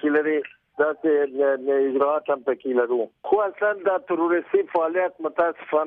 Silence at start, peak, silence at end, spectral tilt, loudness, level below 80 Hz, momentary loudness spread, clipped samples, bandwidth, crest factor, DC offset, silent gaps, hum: 0.05 s; -8 dBFS; 0 s; -8.5 dB/octave; -23 LUFS; -72 dBFS; 4 LU; under 0.1%; 3.7 kHz; 14 dB; under 0.1%; none; none